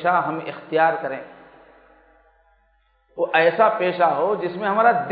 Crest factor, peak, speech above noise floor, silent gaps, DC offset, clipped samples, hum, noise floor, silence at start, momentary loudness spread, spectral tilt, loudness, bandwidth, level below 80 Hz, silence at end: 20 dB; -2 dBFS; 43 dB; none; under 0.1%; under 0.1%; none; -63 dBFS; 0 s; 13 LU; -10 dB/octave; -20 LUFS; 4.9 kHz; -66 dBFS; 0 s